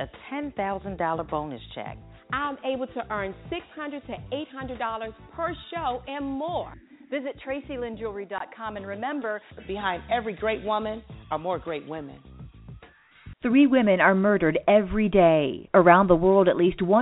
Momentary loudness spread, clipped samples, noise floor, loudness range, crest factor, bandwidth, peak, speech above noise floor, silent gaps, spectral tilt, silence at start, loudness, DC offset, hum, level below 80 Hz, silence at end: 17 LU; under 0.1%; -53 dBFS; 13 LU; 24 dB; 4 kHz; -2 dBFS; 28 dB; none; -5 dB/octave; 0 s; -25 LUFS; under 0.1%; none; -48 dBFS; 0 s